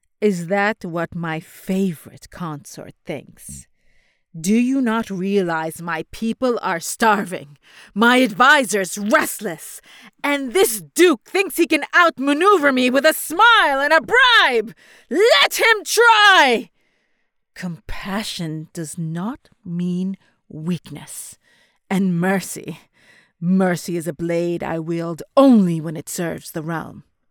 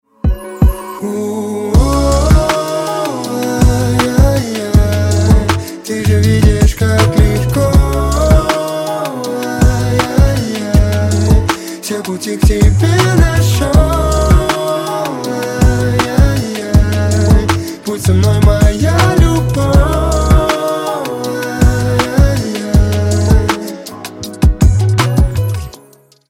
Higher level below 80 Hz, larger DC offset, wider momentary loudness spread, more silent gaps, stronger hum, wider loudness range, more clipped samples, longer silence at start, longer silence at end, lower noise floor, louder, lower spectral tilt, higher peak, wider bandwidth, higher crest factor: second, -52 dBFS vs -16 dBFS; neither; first, 19 LU vs 8 LU; neither; neither; first, 13 LU vs 2 LU; neither; about the same, 0.2 s vs 0.25 s; second, 0.3 s vs 0.6 s; first, -67 dBFS vs -45 dBFS; second, -17 LUFS vs -13 LUFS; second, -4 dB/octave vs -6 dB/octave; second, -4 dBFS vs 0 dBFS; first, over 20 kHz vs 16.5 kHz; about the same, 16 dB vs 12 dB